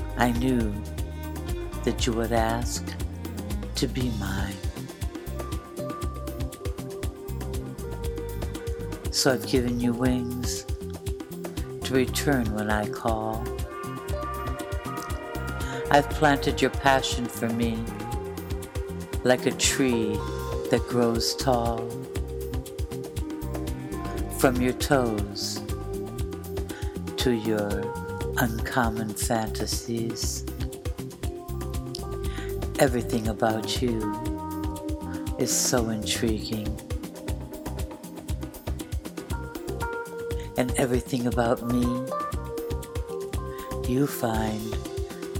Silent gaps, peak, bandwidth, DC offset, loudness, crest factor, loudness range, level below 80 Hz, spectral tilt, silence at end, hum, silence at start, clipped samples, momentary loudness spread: none; -2 dBFS; 19 kHz; under 0.1%; -28 LUFS; 24 dB; 7 LU; -36 dBFS; -4.5 dB/octave; 0 s; none; 0 s; under 0.1%; 11 LU